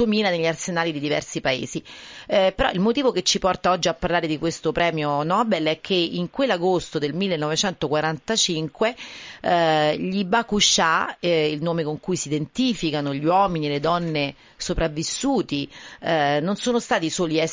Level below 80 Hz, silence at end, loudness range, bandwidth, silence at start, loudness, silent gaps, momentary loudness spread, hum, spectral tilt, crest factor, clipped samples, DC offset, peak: -46 dBFS; 0 s; 3 LU; 7.8 kHz; 0 s; -22 LUFS; none; 7 LU; none; -4 dB/octave; 16 dB; under 0.1%; under 0.1%; -6 dBFS